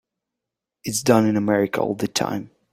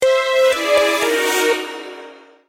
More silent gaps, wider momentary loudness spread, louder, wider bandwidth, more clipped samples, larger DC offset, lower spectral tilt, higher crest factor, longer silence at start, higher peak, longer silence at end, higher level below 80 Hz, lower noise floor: neither; second, 10 LU vs 17 LU; second, -21 LUFS vs -16 LUFS; about the same, 16 kHz vs 16 kHz; neither; neither; first, -4.5 dB/octave vs -0.5 dB/octave; first, 20 dB vs 14 dB; first, 0.85 s vs 0 s; about the same, -2 dBFS vs -4 dBFS; about the same, 0.25 s vs 0.35 s; about the same, -60 dBFS vs -60 dBFS; first, -85 dBFS vs -40 dBFS